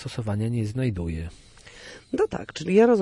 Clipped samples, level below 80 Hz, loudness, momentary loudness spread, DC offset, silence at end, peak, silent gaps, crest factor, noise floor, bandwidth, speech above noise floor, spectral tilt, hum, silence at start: under 0.1%; -48 dBFS; -26 LUFS; 21 LU; under 0.1%; 0 s; -8 dBFS; none; 18 dB; -45 dBFS; 11.5 kHz; 22 dB; -7 dB/octave; none; 0 s